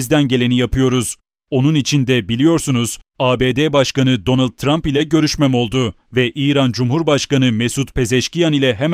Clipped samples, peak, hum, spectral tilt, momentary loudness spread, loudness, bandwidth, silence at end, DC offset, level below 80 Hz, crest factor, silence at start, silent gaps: under 0.1%; -2 dBFS; none; -5.5 dB/octave; 5 LU; -16 LUFS; 15.5 kHz; 0 s; under 0.1%; -36 dBFS; 14 dB; 0 s; none